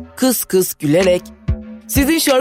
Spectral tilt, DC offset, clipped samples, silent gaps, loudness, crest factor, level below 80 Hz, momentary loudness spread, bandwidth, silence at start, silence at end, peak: -4.5 dB/octave; under 0.1%; under 0.1%; none; -16 LUFS; 14 dB; -32 dBFS; 11 LU; 16.5 kHz; 0 s; 0 s; -2 dBFS